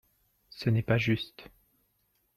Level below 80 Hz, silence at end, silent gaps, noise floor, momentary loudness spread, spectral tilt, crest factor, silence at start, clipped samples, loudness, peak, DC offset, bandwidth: -58 dBFS; 0.9 s; none; -74 dBFS; 15 LU; -7.5 dB/octave; 20 dB; 0.55 s; under 0.1%; -29 LUFS; -12 dBFS; under 0.1%; 13.5 kHz